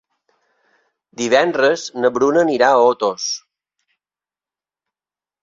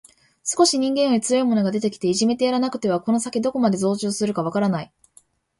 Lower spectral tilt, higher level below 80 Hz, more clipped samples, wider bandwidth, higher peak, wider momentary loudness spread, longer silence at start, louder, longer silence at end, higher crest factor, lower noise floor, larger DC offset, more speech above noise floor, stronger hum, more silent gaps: second, -3 dB/octave vs -4.5 dB/octave; about the same, -64 dBFS vs -64 dBFS; neither; second, 7.6 kHz vs 11.5 kHz; about the same, -2 dBFS vs -4 dBFS; first, 11 LU vs 6 LU; first, 1.2 s vs 0.45 s; first, -16 LUFS vs -21 LUFS; first, 2.05 s vs 0.75 s; about the same, 18 dB vs 18 dB; first, under -90 dBFS vs -57 dBFS; neither; first, over 74 dB vs 36 dB; neither; neither